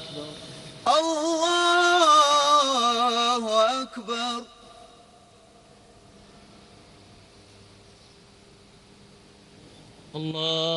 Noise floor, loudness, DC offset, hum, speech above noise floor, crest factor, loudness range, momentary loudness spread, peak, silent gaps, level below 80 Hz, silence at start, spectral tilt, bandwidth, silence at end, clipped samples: -53 dBFS; -22 LUFS; under 0.1%; none; 27 dB; 18 dB; 17 LU; 20 LU; -8 dBFS; none; -64 dBFS; 0 s; -2.5 dB/octave; 11.5 kHz; 0 s; under 0.1%